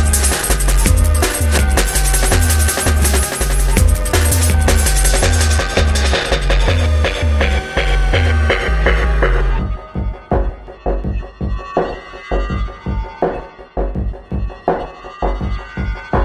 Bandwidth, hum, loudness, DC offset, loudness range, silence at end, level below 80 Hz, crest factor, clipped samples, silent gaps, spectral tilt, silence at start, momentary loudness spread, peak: 15.5 kHz; none; -16 LUFS; under 0.1%; 8 LU; 0 s; -16 dBFS; 14 dB; under 0.1%; none; -4 dB/octave; 0 s; 11 LU; 0 dBFS